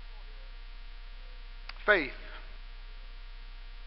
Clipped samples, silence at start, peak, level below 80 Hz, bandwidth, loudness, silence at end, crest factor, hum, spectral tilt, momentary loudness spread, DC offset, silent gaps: under 0.1%; 0 s; -10 dBFS; -44 dBFS; 5.8 kHz; -29 LUFS; 0 s; 26 dB; none; -7.5 dB/octave; 23 LU; 0.1%; none